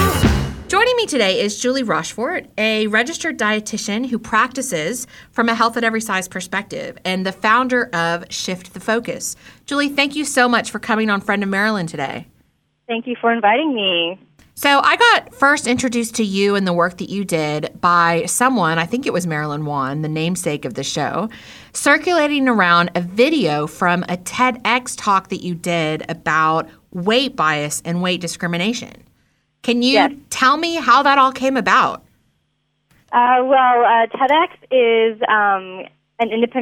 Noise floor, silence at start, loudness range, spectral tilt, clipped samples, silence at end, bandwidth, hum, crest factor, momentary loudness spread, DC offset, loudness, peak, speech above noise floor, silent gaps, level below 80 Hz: -67 dBFS; 0 s; 4 LU; -4 dB/octave; under 0.1%; 0 s; 19 kHz; none; 16 dB; 10 LU; under 0.1%; -17 LUFS; -2 dBFS; 50 dB; none; -42 dBFS